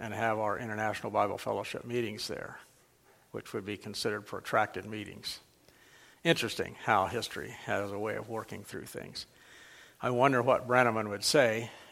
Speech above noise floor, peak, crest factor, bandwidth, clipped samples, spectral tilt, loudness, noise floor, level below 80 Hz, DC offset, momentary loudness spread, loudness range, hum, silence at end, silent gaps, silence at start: 32 dB; -8 dBFS; 24 dB; 16.5 kHz; under 0.1%; -4 dB/octave; -32 LUFS; -64 dBFS; -68 dBFS; under 0.1%; 16 LU; 7 LU; none; 0 s; none; 0 s